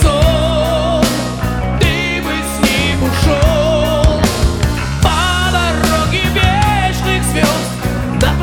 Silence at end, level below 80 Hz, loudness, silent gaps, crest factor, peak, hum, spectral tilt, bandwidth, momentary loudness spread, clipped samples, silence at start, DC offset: 0 s; -20 dBFS; -14 LUFS; none; 12 dB; -2 dBFS; none; -5 dB/octave; 19 kHz; 5 LU; under 0.1%; 0 s; under 0.1%